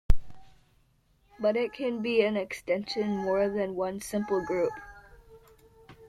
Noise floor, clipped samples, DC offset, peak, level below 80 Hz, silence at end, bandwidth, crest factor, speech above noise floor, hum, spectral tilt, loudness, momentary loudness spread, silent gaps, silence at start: -66 dBFS; under 0.1%; under 0.1%; -6 dBFS; -40 dBFS; 0 s; 13.5 kHz; 22 dB; 37 dB; none; -5.5 dB/octave; -30 LUFS; 7 LU; none; 0.1 s